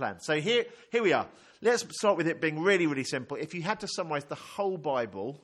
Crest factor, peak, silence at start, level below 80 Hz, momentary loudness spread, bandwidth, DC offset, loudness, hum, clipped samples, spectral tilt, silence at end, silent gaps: 20 dB; -10 dBFS; 0 s; -74 dBFS; 9 LU; 12.5 kHz; under 0.1%; -29 LUFS; none; under 0.1%; -4 dB/octave; 0.05 s; none